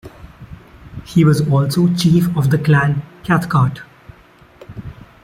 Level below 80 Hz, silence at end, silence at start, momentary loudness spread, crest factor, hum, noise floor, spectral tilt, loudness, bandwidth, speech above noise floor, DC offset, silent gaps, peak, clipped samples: -44 dBFS; 0.3 s; 0.05 s; 22 LU; 16 dB; none; -46 dBFS; -7 dB/octave; -15 LUFS; 15.5 kHz; 32 dB; under 0.1%; none; -2 dBFS; under 0.1%